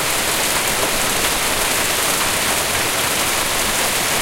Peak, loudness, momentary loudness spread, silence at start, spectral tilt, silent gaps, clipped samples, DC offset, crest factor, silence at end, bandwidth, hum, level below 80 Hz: -4 dBFS; -16 LUFS; 1 LU; 0 s; -1 dB/octave; none; under 0.1%; under 0.1%; 14 dB; 0 s; 16.5 kHz; none; -38 dBFS